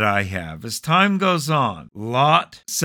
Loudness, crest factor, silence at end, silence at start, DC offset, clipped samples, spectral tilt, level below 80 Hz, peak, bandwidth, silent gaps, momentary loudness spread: -19 LUFS; 18 dB; 0 s; 0 s; under 0.1%; under 0.1%; -4.5 dB/octave; -54 dBFS; -2 dBFS; 19 kHz; none; 12 LU